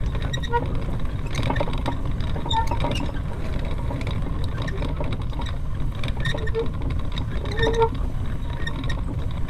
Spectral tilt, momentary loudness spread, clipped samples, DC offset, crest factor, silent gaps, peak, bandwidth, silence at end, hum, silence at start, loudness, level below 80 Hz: -6.5 dB/octave; 6 LU; under 0.1%; under 0.1%; 16 dB; none; -8 dBFS; 12 kHz; 0 s; none; 0 s; -27 LUFS; -28 dBFS